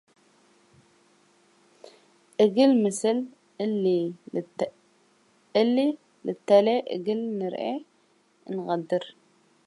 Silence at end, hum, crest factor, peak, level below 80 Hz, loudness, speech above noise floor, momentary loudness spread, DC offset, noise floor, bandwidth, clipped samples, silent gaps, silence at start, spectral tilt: 0.55 s; none; 20 dB; -6 dBFS; -80 dBFS; -26 LUFS; 40 dB; 15 LU; under 0.1%; -65 dBFS; 11.5 kHz; under 0.1%; none; 1.85 s; -5.5 dB/octave